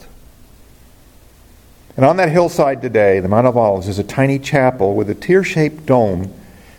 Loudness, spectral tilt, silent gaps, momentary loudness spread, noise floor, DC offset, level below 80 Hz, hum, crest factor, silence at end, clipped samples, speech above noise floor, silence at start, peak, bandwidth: -15 LUFS; -7 dB/octave; none; 7 LU; -45 dBFS; under 0.1%; -46 dBFS; none; 16 dB; 0.4 s; under 0.1%; 31 dB; 0.15 s; 0 dBFS; 17 kHz